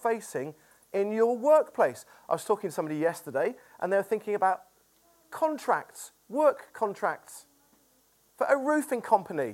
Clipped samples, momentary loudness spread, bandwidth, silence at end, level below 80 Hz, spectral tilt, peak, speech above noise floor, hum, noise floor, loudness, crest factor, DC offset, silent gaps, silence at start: under 0.1%; 12 LU; 17 kHz; 0 s; -80 dBFS; -5 dB/octave; -8 dBFS; 38 dB; none; -66 dBFS; -28 LUFS; 20 dB; under 0.1%; none; 0 s